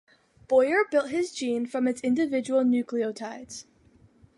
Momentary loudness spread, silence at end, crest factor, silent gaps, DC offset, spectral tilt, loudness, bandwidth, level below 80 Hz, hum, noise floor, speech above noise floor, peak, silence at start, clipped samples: 15 LU; 0.75 s; 16 dB; none; under 0.1%; -4.5 dB/octave; -26 LUFS; 11.5 kHz; -68 dBFS; none; -59 dBFS; 33 dB; -10 dBFS; 0.5 s; under 0.1%